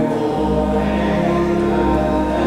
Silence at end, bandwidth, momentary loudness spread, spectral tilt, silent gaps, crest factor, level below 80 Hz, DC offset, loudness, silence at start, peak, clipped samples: 0 s; 13 kHz; 1 LU; -7.5 dB/octave; none; 12 dB; -28 dBFS; under 0.1%; -17 LUFS; 0 s; -4 dBFS; under 0.1%